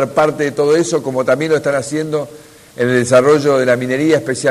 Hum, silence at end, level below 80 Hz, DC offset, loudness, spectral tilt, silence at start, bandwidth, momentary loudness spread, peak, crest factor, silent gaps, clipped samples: none; 0 s; -54 dBFS; under 0.1%; -14 LUFS; -5 dB/octave; 0 s; 14.5 kHz; 8 LU; 0 dBFS; 14 dB; none; under 0.1%